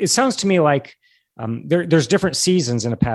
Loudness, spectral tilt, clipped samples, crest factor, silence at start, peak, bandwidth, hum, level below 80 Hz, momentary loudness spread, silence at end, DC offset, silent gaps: -18 LUFS; -4.5 dB/octave; under 0.1%; 16 dB; 0 s; -2 dBFS; 12.5 kHz; none; -46 dBFS; 10 LU; 0 s; under 0.1%; none